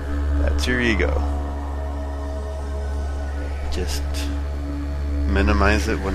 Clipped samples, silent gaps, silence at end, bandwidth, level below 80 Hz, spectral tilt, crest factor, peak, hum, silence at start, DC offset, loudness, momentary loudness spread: under 0.1%; none; 0 s; 13.5 kHz; -24 dBFS; -6 dB/octave; 18 dB; -4 dBFS; none; 0 s; under 0.1%; -24 LUFS; 10 LU